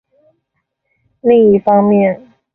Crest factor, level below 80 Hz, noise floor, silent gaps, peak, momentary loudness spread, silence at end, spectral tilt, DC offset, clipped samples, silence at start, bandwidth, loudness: 12 dB; -54 dBFS; -70 dBFS; none; -2 dBFS; 9 LU; 0.4 s; -11.5 dB/octave; under 0.1%; under 0.1%; 1.25 s; 3.4 kHz; -11 LUFS